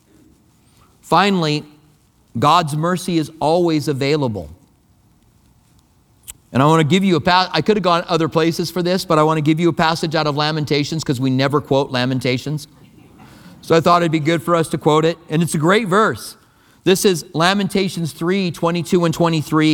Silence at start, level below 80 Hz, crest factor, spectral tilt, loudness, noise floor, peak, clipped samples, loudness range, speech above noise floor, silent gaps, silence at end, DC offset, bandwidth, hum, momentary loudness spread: 1.05 s; -50 dBFS; 18 dB; -5.5 dB/octave; -17 LUFS; -54 dBFS; 0 dBFS; under 0.1%; 4 LU; 38 dB; none; 0 s; under 0.1%; 18.5 kHz; none; 7 LU